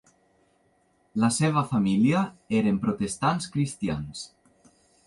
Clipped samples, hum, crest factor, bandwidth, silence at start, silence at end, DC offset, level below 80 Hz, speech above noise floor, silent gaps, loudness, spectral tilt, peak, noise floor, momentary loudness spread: under 0.1%; none; 18 dB; 11.5 kHz; 1.15 s; 0.8 s; under 0.1%; -56 dBFS; 41 dB; none; -26 LUFS; -5.5 dB/octave; -10 dBFS; -66 dBFS; 12 LU